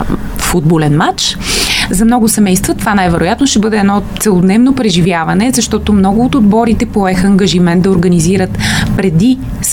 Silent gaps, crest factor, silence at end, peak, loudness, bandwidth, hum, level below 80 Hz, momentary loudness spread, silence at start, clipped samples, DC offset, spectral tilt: none; 10 dB; 0 s; 0 dBFS; -10 LUFS; 17 kHz; none; -26 dBFS; 3 LU; 0 s; under 0.1%; under 0.1%; -5 dB/octave